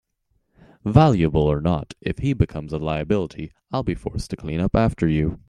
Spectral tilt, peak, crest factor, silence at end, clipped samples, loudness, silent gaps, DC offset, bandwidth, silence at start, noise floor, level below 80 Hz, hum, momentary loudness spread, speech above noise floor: -8 dB/octave; 0 dBFS; 20 dB; 0.1 s; under 0.1%; -22 LUFS; none; under 0.1%; 10.5 kHz; 0.85 s; -69 dBFS; -38 dBFS; none; 13 LU; 48 dB